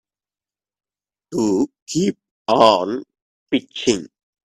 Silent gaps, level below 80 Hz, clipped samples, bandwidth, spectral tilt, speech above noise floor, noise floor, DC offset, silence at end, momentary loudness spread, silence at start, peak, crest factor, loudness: 1.82-1.86 s, 2.31-2.45 s, 3.22-3.46 s; -60 dBFS; under 0.1%; 13 kHz; -4.5 dB/octave; over 72 dB; under -90 dBFS; under 0.1%; 0.35 s; 13 LU; 1.3 s; 0 dBFS; 22 dB; -19 LUFS